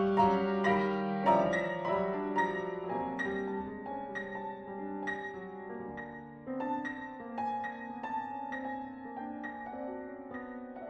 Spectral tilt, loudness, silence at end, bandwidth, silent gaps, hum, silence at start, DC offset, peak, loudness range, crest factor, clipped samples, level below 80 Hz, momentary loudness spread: -7 dB/octave; -35 LUFS; 0 s; 8.4 kHz; none; none; 0 s; under 0.1%; -14 dBFS; 8 LU; 20 dB; under 0.1%; -64 dBFS; 15 LU